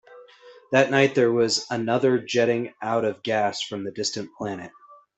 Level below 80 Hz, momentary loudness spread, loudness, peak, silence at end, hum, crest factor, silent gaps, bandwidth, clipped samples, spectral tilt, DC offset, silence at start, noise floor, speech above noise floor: -68 dBFS; 13 LU; -23 LUFS; -4 dBFS; 0.25 s; none; 20 dB; none; 8.4 kHz; under 0.1%; -4.5 dB/octave; under 0.1%; 0.1 s; -49 dBFS; 26 dB